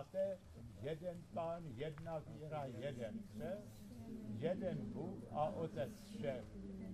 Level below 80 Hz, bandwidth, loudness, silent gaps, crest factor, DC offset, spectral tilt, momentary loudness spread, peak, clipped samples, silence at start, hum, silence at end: -66 dBFS; 14 kHz; -47 LUFS; none; 18 dB; under 0.1%; -7.5 dB/octave; 9 LU; -28 dBFS; under 0.1%; 0 s; none; 0 s